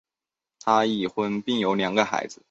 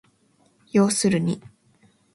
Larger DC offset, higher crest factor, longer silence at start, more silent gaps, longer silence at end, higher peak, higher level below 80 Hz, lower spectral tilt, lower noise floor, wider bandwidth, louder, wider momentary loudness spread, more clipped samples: neither; about the same, 20 dB vs 18 dB; about the same, 0.65 s vs 0.75 s; neither; second, 0.15 s vs 0.75 s; about the same, -6 dBFS vs -8 dBFS; about the same, -66 dBFS vs -62 dBFS; about the same, -4.5 dB/octave vs -5 dB/octave; first, -90 dBFS vs -62 dBFS; second, 8 kHz vs 12 kHz; about the same, -24 LUFS vs -22 LUFS; second, 6 LU vs 9 LU; neither